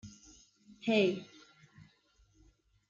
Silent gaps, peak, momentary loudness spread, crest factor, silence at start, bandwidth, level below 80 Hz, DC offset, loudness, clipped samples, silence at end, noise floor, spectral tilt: none; -16 dBFS; 26 LU; 22 dB; 0.05 s; 7.6 kHz; -72 dBFS; under 0.1%; -32 LUFS; under 0.1%; 1.65 s; -69 dBFS; -5.5 dB/octave